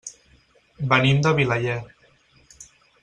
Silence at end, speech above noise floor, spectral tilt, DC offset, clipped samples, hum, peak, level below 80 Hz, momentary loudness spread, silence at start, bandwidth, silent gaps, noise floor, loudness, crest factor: 0.4 s; 38 dB; -5.5 dB/octave; under 0.1%; under 0.1%; none; -2 dBFS; -54 dBFS; 14 LU; 0.05 s; 9.4 kHz; none; -58 dBFS; -21 LUFS; 22 dB